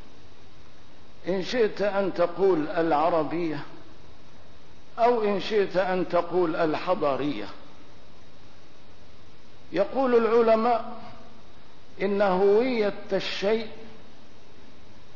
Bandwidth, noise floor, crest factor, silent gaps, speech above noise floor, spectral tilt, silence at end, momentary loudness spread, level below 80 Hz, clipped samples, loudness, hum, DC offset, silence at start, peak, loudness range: 6 kHz; -53 dBFS; 16 dB; none; 29 dB; -6.5 dB/octave; 1.25 s; 16 LU; -60 dBFS; under 0.1%; -25 LUFS; none; 2%; 1.25 s; -10 dBFS; 4 LU